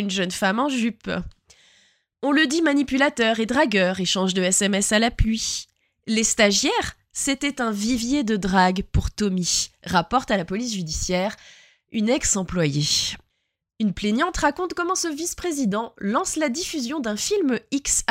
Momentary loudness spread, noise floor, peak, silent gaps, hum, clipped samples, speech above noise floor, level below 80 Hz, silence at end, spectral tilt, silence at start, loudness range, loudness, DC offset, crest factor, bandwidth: 8 LU; -76 dBFS; -4 dBFS; none; none; under 0.1%; 54 dB; -38 dBFS; 0.05 s; -3.5 dB/octave; 0 s; 4 LU; -22 LUFS; under 0.1%; 18 dB; 16 kHz